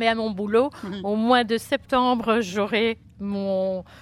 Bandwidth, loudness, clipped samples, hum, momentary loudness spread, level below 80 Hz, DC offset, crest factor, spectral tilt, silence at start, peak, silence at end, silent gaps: 14.5 kHz; -23 LUFS; under 0.1%; none; 8 LU; -54 dBFS; under 0.1%; 18 dB; -5 dB/octave; 0 s; -6 dBFS; 0 s; none